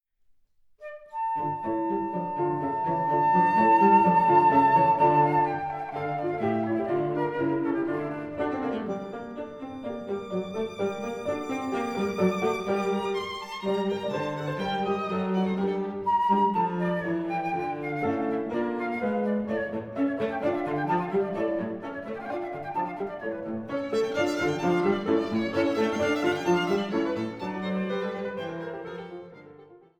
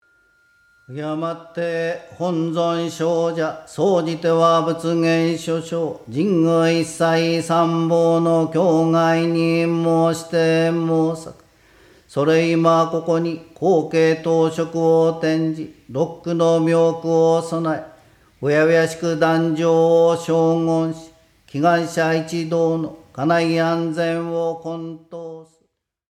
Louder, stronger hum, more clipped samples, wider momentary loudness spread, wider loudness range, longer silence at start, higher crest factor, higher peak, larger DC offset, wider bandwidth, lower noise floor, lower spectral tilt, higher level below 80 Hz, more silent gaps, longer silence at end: second, -27 LUFS vs -19 LUFS; neither; neither; first, 13 LU vs 10 LU; first, 9 LU vs 4 LU; about the same, 0.8 s vs 0.9 s; about the same, 18 dB vs 14 dB; second, -8 dBFS vs -4 dBFS; neither; about the same, 13 kHz vs 13 kHz; second, -63 dBFS vs -68 dBFS; about the same, -6.5 dB/octave vs -6.5 dB/octave; about the same, -64 dBFS vs -62 dBFS; neither; second, 0.2 s vs 0.7 s